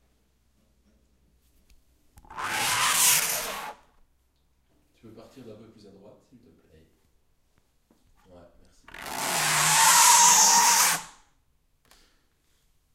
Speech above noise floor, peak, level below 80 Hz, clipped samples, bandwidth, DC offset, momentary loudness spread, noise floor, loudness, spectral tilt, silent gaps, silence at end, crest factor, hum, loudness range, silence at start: 18 dB; -4 dBFS; -62 dBFS; under 0.1%; 16 kHz; under 0.1%; 22 LU; -68 dBFS; -19 LUFS; 1 dB/octave; none; 1.9 s; 24 dB; none; 12 LU; 2.3 s